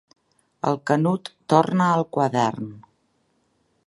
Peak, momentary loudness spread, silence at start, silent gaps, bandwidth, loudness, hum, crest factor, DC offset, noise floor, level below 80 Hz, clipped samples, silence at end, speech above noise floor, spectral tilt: -2 dBFS; 10 LU; 0.65 s; none; 11.5 kHz; -22 LUFS; none; 22 dB; under 0.1%; -68 dBFS; -68 dBFS; under 0.1%; 1.05 s; 46 dB; -7 dB/octave